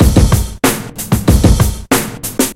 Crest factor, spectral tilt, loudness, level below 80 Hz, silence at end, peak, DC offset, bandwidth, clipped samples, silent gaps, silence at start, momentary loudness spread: 12 dB; -5 dB/octave; -13 LUFS; -16 dBFS; 0 s; 0 dBFS; under 0.1%; 16.5 kHz; 0.8%; none; 0 s; 7 LU